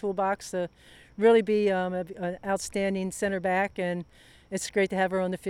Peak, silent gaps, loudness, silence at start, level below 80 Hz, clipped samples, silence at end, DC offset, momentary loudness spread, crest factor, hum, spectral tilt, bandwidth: -10 dBFS; none; -28 LUFS; 0 s; -60 dBFS; under 0.1%; 0 s; under 0.1%; 13 LU; 16 dB; none; -5 dB/octave; 14 kHz